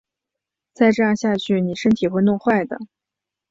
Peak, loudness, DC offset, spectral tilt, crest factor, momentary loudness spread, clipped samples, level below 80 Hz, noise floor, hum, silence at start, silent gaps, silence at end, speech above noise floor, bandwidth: -4 dBFS; -19 LUFS; under 0.1%; -6.5 dB/octave; 16 dB; 5 LU; under 0.1%; -58 dBFS; -85 dBFS; none; 0.8 s; none; 0.65 s; 67 dB; 7.8 kHz